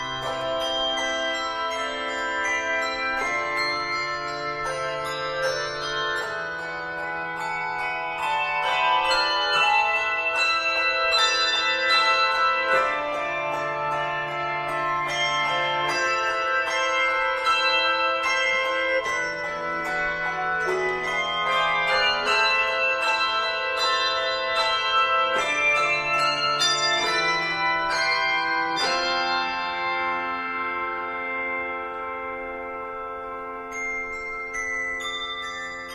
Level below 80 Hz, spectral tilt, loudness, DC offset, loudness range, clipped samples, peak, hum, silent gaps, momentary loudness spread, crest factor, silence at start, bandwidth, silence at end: -54 dBFS; -1.5 dB/octave; -23 LUFS; under 0.1%; 7 LU; under 0.1%; -8 dBFS; none; none; 9 LU; 16 dB; 0 s; 15.5 kHz; 0 s